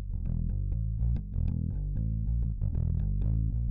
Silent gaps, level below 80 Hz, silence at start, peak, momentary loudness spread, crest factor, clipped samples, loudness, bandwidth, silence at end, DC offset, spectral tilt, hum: none; -32 dBFS; 0 s; -22 dBFS; 3 LU; 8 dB; under 0.1%; -32 LUFS; 1.6 kHz; 0 s; under 0.1%; -13 dB/octave; none